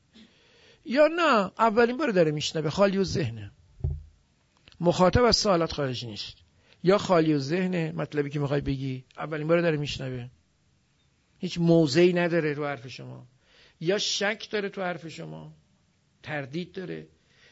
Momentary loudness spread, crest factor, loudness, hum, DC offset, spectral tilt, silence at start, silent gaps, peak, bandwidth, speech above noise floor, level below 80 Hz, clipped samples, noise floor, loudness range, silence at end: 18 LU; 18 dB; -26 LUFS; none; under 0.1%; -5.5 dB/octave; 0.85 s; none; -8 dBFS; 8 kHz; 42 dB; -48 dBFS; under 0.1%; -67 dBFS; 7 LU; 0.45 s